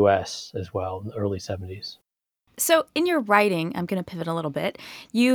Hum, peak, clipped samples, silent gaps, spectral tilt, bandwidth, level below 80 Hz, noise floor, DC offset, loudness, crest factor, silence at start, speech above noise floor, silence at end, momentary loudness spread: none; -4 dBFS; under 0.1%; none; -4.5 dB/octave; over 20 kHz; -60 dBFS; -73 dBFS; under 0.1%; -25 LUFS; 20 dB; 0 s; 48 dB; 0 s; 13 LU